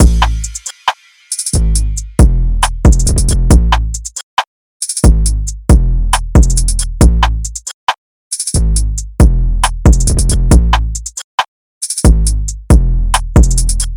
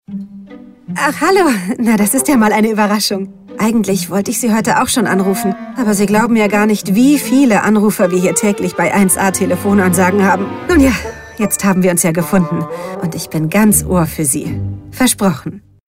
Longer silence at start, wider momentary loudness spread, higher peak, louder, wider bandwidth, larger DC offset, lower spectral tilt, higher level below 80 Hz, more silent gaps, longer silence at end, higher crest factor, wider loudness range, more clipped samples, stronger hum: about the same, 0 s vs 0.1 s; about the same, 10 LU vs 10 LU; about the same, 0 dBFS vs 0 dBFS; about the same, -13 LUFS vs -13 LUFS; second, 14 kHz vs 16.5 kHz; first, 1% vs under 0.1%; about the same, -4.5 dB/octave vs -4.5 dB/octave; first, -12 dBFS vs -36 dBFS; first, 4.23-4.37 s, 4.47-4.80 s, 7.74-7.87 s, 7.98-8.31 s, 11.24-11.38 s, 11.48-11.81 s vs none; second, 0 s vs 0.35 s; about the same, 10 dB vs 12 dB; about the same, 1 LU vs 3 LU; neither; neither